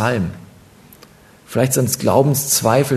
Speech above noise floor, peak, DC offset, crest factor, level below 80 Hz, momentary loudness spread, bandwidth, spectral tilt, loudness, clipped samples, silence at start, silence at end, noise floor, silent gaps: 30 dB; 0 dBFS; under 0.1%; 18 dB; -50 dBFS; 11 LU; 14 kHz; -4.5 dB/octave; -17 LUFS; under 0.1%; 0 s; 0 s; -46 dBFS; none